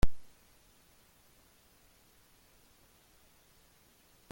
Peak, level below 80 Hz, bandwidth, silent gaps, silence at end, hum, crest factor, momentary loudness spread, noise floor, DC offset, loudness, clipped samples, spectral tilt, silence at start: -12 dBFS; -44 dBFS; 17 kHz; none; 4.1 s; none; 22 dB; 0 LU; -65 dBFS; under 0.1%; -55 LUFS; under 0.1%; -5.5 dB/octave; 0.05 s